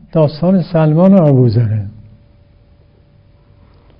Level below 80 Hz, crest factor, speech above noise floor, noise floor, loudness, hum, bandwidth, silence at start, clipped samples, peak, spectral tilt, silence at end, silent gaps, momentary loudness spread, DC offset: -44 dBFS; 14 dB; 36 dB; -47 dBFS; -11 LUFS; none; 5.4 kHz; 0.15 s; 0.2%; 0 dBFS; -12 dB/octave; 2.1 s; none; 10 LU; under 0.1%